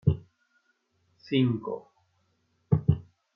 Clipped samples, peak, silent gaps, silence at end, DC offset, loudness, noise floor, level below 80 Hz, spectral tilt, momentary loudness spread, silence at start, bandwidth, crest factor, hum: under 0.1%; -10 dBFS; none; 0.35 s; under 0.1%; -29 LUFS; -72 dBFS; -52 dBFS; -10 dB/octave; 11 LU; 0.05 s; 5.6 kHz; 20 dB; none